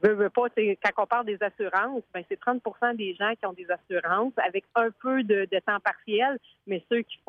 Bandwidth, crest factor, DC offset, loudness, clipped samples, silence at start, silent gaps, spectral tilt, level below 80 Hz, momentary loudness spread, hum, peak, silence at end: 6.6 kHz; 16 dB; under 0.1%; -27 LUFS; under 0.1%; 0 s; none; -6.5 dB/octave; -74 dBFS; 7 LU; none; -10 dBFS; 0.15 s